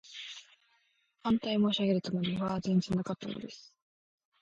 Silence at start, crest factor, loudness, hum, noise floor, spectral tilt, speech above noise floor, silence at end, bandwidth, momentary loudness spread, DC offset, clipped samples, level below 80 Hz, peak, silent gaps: 0.05 s; 16 dB; -32 LUFS; none; -73 dBFS; -6.5 dB/octave; 42 dB; 0.8 s; 7.8 kHz; 16 LU; under 0.1%; under 0.1%; -64 dBFS; -18 dBFS; none